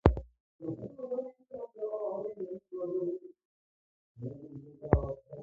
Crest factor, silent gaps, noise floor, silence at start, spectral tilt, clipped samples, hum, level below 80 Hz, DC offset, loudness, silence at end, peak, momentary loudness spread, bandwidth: 30 dB; 0.40-0.59 s, 3.45-4.15 s; under -90 dBFS; 0.05 s; -9 dB/octave; under 0.1%; none; -42 dBFS; under 0.1%; -37 LUFS; 0 s; -4 dBFS; 16 LU; 7.4 kHz